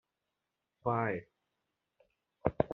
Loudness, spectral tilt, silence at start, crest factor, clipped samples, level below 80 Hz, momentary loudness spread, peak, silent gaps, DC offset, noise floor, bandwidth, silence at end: -36 LUFS; -8 dB/octave; 0.85 s; 30 dB; under 0.1%; -60 dBFS; 7 LU; -10 dBFS; none; under 0.1%; -87 dBFS; 4.2 kHz; 0 s